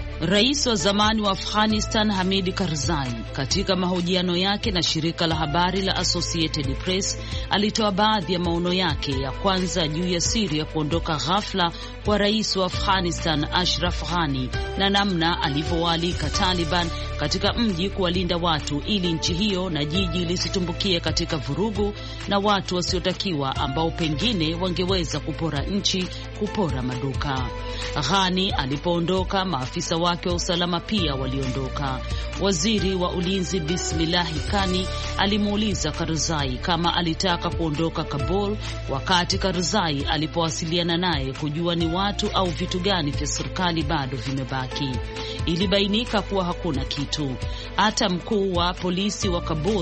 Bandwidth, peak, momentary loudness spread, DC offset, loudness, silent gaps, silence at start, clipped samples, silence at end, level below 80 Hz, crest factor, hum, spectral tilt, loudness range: 8.8 kHz; -4 dBFS; 6 LU; under 0.1%; -23 LUFS; none; 0 s; under 0.1%; 0 s; -34 dBFS; 20 dB; none; -4.5 dB/octave; 2 LU